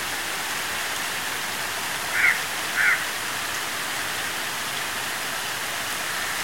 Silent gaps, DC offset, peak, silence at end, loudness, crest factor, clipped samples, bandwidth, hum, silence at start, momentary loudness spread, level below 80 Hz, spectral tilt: none; 0.5%; -6 dBFS; 0 s; -25 LUFS; 20 dB; under 0.1%; 16.5 kHz; none; 0 s; 6 LU; -60 dBFS; 0 dB/octave